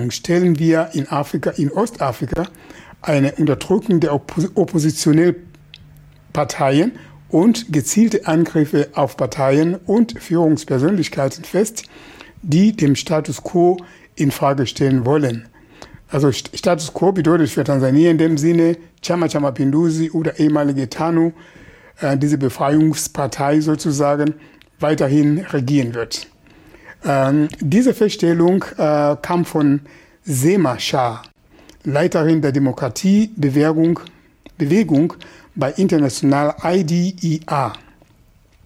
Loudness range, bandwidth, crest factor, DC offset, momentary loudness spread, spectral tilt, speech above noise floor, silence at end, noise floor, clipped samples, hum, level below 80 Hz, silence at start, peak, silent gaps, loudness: 3 LU; 16 kHz; 14 dB; under 0.1%; 8 LU; -6.5 dB/octave; 35 dB; 0.9 s; -52 dBFS; under 0.1%; none; -50 dBFS; 0 s; -4 dBFS; none; -17 LUFS